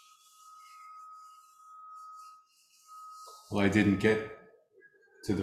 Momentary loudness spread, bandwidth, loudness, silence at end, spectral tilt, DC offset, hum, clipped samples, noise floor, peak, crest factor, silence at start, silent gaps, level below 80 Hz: 27 LU; 14 kHz; -29 LUFS; 0 s; -6.5 dB/octave; under 0.1%; none; under 0.1%; -64 dBFS; -10 dBFS; 24 dB; 0.8 s; none; -58 dBFS